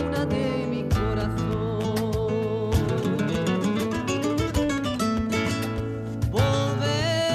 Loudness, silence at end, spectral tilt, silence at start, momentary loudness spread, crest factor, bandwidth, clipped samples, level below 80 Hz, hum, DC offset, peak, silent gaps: -25 LUFS; 0 s; -6 dB/octave; 0 s; 3 LU; 14 dB; 15.5 kHz; under 0.1%; -38 dBFS; none; under 0.1%; -10 dBFS; none